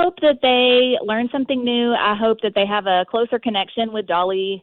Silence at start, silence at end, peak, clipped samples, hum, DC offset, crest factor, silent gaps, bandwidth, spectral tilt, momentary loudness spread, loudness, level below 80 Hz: 0 s; 0.05 s; -4 dBFS; under 0.1%; none; under 0.1%; 14 dB; none; 4.4 kHz; -7.5 dB/octave; 7 LU; -18 LUFS; -58 dBFS